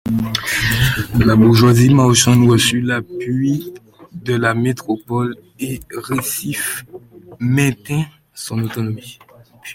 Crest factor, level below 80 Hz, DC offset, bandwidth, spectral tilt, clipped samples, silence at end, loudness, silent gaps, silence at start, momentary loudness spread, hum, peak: 16 dB; -38 dBFS; under 0.1%; 17 kHz; -5 dB/octave; under 0.1%; 0 s; -16 LUFS; none; 0.05 s; 16 LU; none; 0 dBFS